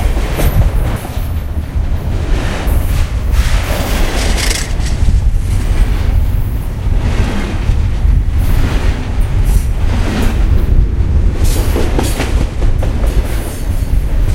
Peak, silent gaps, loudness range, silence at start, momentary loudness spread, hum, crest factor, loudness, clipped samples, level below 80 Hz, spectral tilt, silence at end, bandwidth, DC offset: 0 dBFS; none; 2 LU; 0 s; 5 LU; none; 12 dB; -16 LUFS; under 0.1%; -12 dBFS; -5.5 dB/octave; 0 s; 16.5 kHz; 0.6%